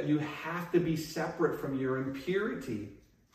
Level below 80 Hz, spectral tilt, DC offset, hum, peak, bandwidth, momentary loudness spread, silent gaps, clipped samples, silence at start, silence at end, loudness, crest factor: -62 dBFS; -6.5 dB/octave; under 0.1%; none; -16 dBFS; 15.5 kHz; 8 LU; none; under 0.1%; 0 s; 0.35 s; -33 LUFS; 18 dB